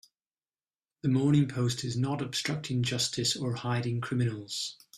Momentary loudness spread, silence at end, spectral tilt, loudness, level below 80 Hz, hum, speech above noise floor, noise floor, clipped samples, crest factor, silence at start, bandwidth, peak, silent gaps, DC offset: 7 LU; 0 s; -5 dB/octave; -30 LUFS; -64 dBFS; none; over 60 dB; under -90 dBFS; under 0.1%; 16 dB; 1.05 s; 14 kHz; -14 dBFS; none; under 0.1%